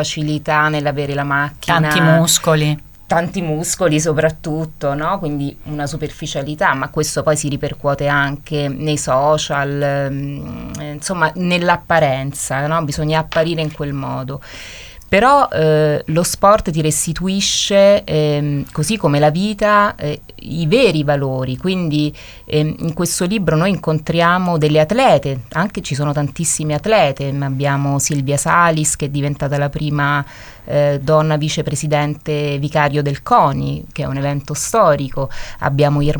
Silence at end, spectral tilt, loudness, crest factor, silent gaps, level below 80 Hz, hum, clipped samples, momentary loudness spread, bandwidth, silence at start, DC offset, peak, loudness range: 0 s; -4.5 dB/octave; -16 LUFS; 16 dB; none; -40 dBFS; none; under 0.1%; 11 LU; over 20 kHz; 0 s; under 0.1%; 0 dBFS; 4 LU